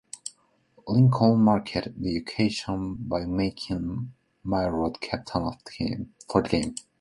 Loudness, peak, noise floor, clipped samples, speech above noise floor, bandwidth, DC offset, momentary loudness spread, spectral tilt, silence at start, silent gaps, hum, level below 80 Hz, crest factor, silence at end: -26 LUFS; -4 dBFS; -62 dBFS; under 0.1%; 36 dB; 11.5 kHz; under 0.1%; 16 LU; -6.5 dB/octave; 0.15 s; none; none; -48 dBFS; 22 dB; 0.2 s